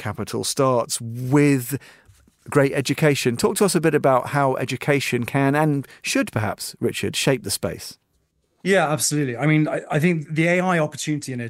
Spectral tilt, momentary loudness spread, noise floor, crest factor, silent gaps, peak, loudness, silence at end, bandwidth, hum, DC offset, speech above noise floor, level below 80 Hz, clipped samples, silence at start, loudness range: -5 dB/octave; 8 LU; -68 dBFS; 18 dB; none; -4 dBFS; -21 LUFS; 0 s; 16 kHz; none; under 0.1%; 47 dB; -58 dBFS; under 0.1%; 0 s; 3 LU